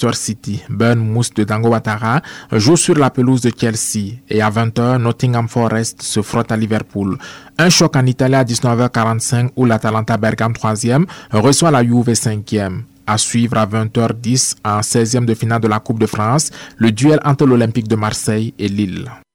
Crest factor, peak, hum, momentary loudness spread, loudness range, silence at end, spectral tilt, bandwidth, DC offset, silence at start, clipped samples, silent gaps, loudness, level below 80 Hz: 12 dB; -2 dBFS; none; 8 LU; 2 LU; 0.15 s; -5 dB/octave; 16.5 kHz; under 0.1%; 0 s; under 0.1%; none; -15 LUFS; -48 dBFS